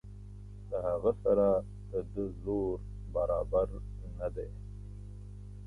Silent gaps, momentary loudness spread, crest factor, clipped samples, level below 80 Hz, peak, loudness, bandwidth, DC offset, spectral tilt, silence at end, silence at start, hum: none; 19 LU; 18 dB; under 0.1%; -46 dBFS; -16 dBFS; -33 LUFS; 11 kHz; under 0.1%; -10 dB/octave; 0 s; 0.05 s; 50 Hz at -45 dBFS